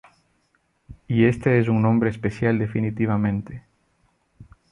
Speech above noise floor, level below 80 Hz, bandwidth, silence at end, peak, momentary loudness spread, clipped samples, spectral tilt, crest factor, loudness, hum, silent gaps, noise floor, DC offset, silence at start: 47 dB; -50 dBFS; 10 kHz; 0.3 s; -6 dBFS; 8 LU; under 0.1%; -9 dB/octave; 18 dB; -22 LUFS; none; none; -67 dBFS; under 0.1%; 0.9 s